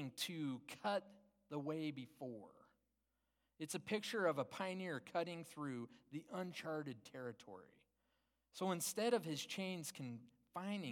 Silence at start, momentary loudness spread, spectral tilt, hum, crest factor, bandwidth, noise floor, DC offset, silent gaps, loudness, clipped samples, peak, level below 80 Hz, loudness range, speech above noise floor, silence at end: 0 s; 14 LU; -4 dB/octave; none; 22 dB; 17.5 kHz; -87 dBFS; under 0.1%; none; -45 LUFS; under 0.1%; -24 dBFS; -90 dBFS; 5 LU; 42 dB; 0 s